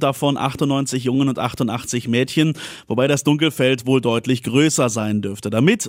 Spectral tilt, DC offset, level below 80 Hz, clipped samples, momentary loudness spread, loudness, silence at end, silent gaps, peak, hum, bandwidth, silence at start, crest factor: -5 dB/octave; under 0.1%; -56 dBFS; under 0.1%; 6 LU; -19 LUFS; 0 s; none; -2 dBFS; none; 16 kHz; 0 s; 16 dB